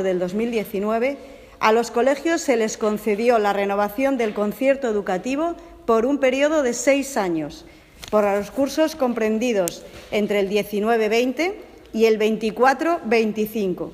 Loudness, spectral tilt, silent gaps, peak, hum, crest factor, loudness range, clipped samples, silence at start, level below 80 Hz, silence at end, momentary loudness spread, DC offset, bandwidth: -21 LUFS; -4.5 dB/octave; none; 0 dBFS; none; 20 dB; 2 LU; under 0.1%; 0 s; -54 dBFS; 0 s; 7 LU; under 0.1%; 15.5 kHz